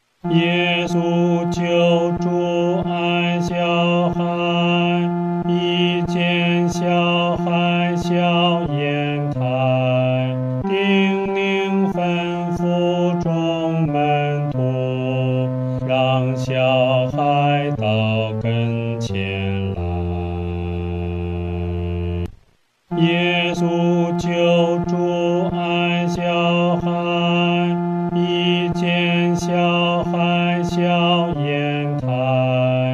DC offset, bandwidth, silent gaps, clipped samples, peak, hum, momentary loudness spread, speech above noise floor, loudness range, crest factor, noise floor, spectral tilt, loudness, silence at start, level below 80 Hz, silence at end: under 0.1%; 7.6 kHz; none; under 0.1%; -6 dBFS; none; 6 LU; 41 dB; 4 LU; 14 dB; -58 dBFS; -7 dB/octave; -19 LUFS; 0.25 s; -46 dBFS; 0 s